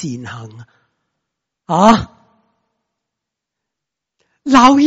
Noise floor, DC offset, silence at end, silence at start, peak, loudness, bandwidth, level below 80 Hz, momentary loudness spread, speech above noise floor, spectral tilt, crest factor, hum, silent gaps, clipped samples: -82 dBFS; under 0.1%; 0 s; 0 s; 0 dBFS; -12 LUFS; 8 kHz; -44 dBFS; 22 LU; 70 dB; -5 dB/octave; 16 dB; none; none; under 0.1%